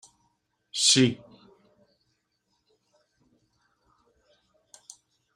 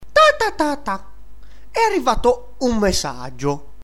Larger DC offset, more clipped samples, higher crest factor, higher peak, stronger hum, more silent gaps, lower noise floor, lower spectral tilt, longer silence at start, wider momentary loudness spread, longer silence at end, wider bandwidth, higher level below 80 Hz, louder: second, under 0.1% vs 3%; neither; first, 26 dB vs 16 dB; second, -8 dBFS vs -2 dBFS; neither; neither; first, -76 dBFS vs -42 dBFS; second, -2.5 dB/octave vs -4 dB/octave; first, 0.75 s vs 0 s; first, 30 LU vs 13 LU; first, 4.2 s vs 0.25 s; about the same, 15.5 kHz vs 16 kHz; second, -74 dBFS vs -34 dBFS; second, -22 LUFS vs -19 LUFS